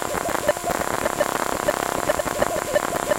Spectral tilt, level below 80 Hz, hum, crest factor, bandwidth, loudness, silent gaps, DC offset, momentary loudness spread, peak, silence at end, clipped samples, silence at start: -3 dB/octave; -44 dBFS; none; 18 dB; 17 kHz; -23 LUFS; none; under 0.1%; 1 LU; -6 dBFS; 0 s; under 0.1%; 0 s